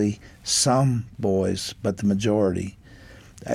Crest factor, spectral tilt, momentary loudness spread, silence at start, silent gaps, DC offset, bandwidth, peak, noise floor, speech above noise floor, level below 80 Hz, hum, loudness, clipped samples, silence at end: 16 dB; -5 dB/octave; 12 LU; 0 s; none; under 0.1%; 15.5 kHz; -8 dBFS; -46 dBFS; 23 dB; -52 dBFS; none; -23 LUFS; under 0.1%; 0 s